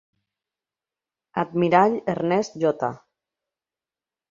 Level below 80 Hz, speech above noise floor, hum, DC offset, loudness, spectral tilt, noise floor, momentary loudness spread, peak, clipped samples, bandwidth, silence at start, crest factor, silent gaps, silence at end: -68 dBFS; over 69 dB; none; under 0.1%; -23 LUFS; -6.5 dB/octave; under -90 dBFS; 11 LU; -4 dBFS; under 0.1%; 7.6 kHz; 1.35 s; 22 dB; none; 1.35 s